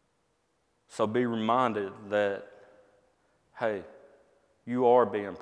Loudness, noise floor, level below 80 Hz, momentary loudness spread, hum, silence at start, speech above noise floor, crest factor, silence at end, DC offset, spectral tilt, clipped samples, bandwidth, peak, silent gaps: -28 LUFS; -74 dBFS; -76 dBFS; 15 LU; none; 0.95 s; 46 dB; 20 dB; 0 s; under 0.1%; -6.5 dB/octave; under 0.1%; 10.5 kHz; -10 dBFS; none